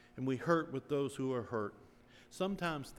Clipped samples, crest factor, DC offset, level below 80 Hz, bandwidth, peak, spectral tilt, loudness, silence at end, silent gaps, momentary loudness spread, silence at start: under 0.1%; 20 dB; under 0.1%; -66 dBFS; 16 kHz; -18 dBFS; -6.5 dB/octave; -37 LUFS; 0 s; none; 7 LU; 0.15 s